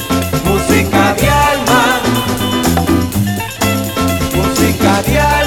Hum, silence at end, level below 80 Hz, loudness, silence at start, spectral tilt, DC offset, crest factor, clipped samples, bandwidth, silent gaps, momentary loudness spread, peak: none; 0 s; -26 dBFS; -12 LUFS; 0 s; -4.5 dB/octave; under 0.1%; 12 dB; under 0.1%; 19.5 kHz; none; 5 LU; 0 dBFS